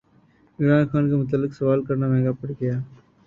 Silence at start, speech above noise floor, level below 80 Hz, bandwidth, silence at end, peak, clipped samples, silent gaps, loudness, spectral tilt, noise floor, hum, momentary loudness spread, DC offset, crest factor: 0.6 s; 36 dB; -56 dBFS; 5.4 kHz; 0.4 s; -6 dBFS; under 0.1%; none; -22 LUFS; -10.5 dB/octave; -58 dBFS; none; 8 LU; under 0.1%; 16 dB